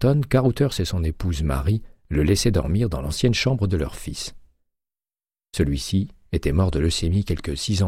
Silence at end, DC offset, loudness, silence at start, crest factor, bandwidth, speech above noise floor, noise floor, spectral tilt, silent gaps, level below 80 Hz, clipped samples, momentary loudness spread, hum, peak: 0 s; under 0.1%; -23 LUFS; 0 s; 16 dB; 15.5 kHz; over 69 dB; under -90 dBFS; -6 dB/octave; none; -32 dBFS; under 0.1%; 9 LU; none; -6 dBFS